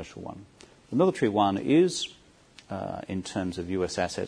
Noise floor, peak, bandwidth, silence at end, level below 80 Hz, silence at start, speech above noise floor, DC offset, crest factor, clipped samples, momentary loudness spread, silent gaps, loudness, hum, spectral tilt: -55 dBFS; -10 dBFS; 10.5 kHz; 0 s; -60 dBFS; 0 s; 28 dB; under 0.1%; 18 dB; under 0.1%; 17 LU; none; -27 LUFS; none; -5.5 dB/octave